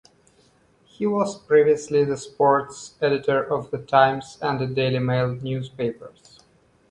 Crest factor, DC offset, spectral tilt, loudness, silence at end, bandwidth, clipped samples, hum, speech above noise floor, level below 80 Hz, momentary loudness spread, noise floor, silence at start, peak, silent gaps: 20 dB; under 0.1%; -6 dB/octave; -22 LUFS; 0.8 s; 10.5 kHz; under 0.1%; none; 37 dB; -60 dBFS; 11 LU; -59 dBFS; 1 s; -2 dBFS; none